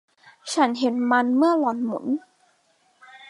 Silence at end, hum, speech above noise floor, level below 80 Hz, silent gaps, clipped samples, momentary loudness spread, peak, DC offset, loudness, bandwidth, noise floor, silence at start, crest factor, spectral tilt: 0.05 s; none; 43 dB; -80 dBFS; none; under 0.1%; 9 LU; -6 dBFS; under 0.1%; -22 LUFS; 11.5 kHz; -64 dBFS; 0.45 s; 18 dB; -4 dB/octave